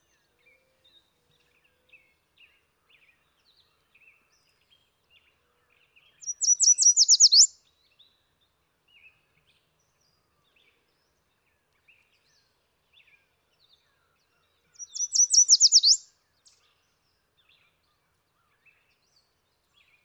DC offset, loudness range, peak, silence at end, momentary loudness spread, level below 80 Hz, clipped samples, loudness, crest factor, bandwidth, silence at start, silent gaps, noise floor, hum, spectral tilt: under 0.1%; 9 LU; -8 dBFS; 4.05 s; 22 LU; -84 dBFS; under 0.1%; -17 LUFS; 22 dB; 19 kHz; 6.25 s; none; -73 dBFS; none; 6.5 dB/octave